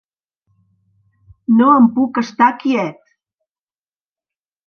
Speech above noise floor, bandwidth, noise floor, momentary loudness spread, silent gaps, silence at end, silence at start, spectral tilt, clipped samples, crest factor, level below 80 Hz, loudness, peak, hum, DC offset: over 77 dB; 6.6 kHz; under -90 dBFS; 11 LU; none; 1.75 s; 1.5 s; -6.5 dB/octave; under 0.1%; 18 dB; -62 dBFS; -14 LUFS; 0 dBFS; none; under 0.1%